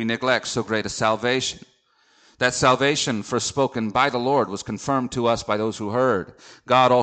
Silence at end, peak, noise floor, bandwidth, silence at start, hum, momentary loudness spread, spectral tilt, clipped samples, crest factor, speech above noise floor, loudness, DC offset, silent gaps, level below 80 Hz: 0 s; -2 dBFS; -61 dBFS; 9.4 kHz; 0 s; none; 7 LU; -4 dB/octave; under 0.1%; 20 dB; 39 dB; -22 LUFS; under 0.1%; none; -54 dBFS